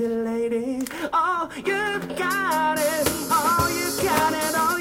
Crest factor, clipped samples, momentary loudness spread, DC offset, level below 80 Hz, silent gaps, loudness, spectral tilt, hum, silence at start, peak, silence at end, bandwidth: 16 dB; under 0.1%; 5 LU; under 0.1%; -50 dBFS; none; -23 LUFS; -3 dB/octave; none; 0 s; -6 dBFS; 0 s; 17 kHz